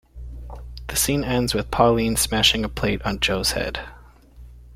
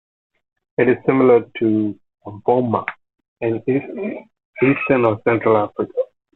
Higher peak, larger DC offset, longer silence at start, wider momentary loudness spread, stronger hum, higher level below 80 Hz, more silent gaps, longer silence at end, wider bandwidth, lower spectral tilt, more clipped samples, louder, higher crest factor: about the same, -2 dBFS vs -2 dBFS; neither; second, 0.15 s vs 0.8 s; first, 21 LU vs 13 LU; neither; first, -36 dBFS vs -58 dBFS; second, none vs 3.28-3.36 s, 4.45-4.53 s; second, 0 s vs 0.3 s; first, 16.5 kHz vs 4.1 kHz; second, -3.5 dB/octave vs -10.5 dB/octave; neither; about the same, -21 LUFS vs -19 LUFS; about the same, 20 dB vs 16 dB